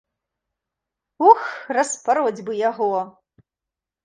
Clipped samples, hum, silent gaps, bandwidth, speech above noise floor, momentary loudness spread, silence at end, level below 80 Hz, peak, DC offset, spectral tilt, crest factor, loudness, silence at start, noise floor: under 0.1%; none; none; 10 kHz; 68 dB; 9 LU; 0.95 s; -72 dBFS; 0 dBFS; under 0.1%; -3.5 dB/octave; 22 dB; -20 LUFS; 1.2 s; -87 dBFS